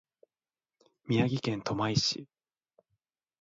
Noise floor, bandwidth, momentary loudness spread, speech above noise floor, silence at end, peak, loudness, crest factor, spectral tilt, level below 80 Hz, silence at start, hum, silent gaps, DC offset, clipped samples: under -90 dBFS; 7.8 kHz; 5 LU; over 60 dB; 1.15 s; -12 dBFS; -30 LUFS; 22 dB; -5 dB/octave; -64 dBFS; 1.05 s; none; none; under 0.1%; under 0.1%